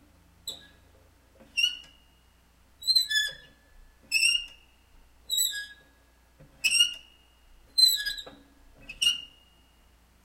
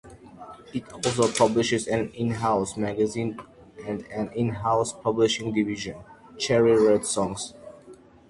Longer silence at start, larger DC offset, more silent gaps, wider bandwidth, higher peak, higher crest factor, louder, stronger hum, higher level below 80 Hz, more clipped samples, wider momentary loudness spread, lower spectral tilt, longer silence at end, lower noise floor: first, 0.45 s vs 0.05 s; neither; neither; first, 16 kHz vs 11.5 kHz; about the same, -10 dBFS vs -8 dBFS; about the same, 22 dB vs 18 dB; about the same, -25 LUFS vs -25 LUFS; neither; about the same, -60 dBFS vs -56 dBFS; neither; first, 23 LU vs 16 LU; second, 3 dB/octave vs -4.5 dB/octave; first, 1 s vs 0.35 s; first, -61 dBFS vs -50 dBFS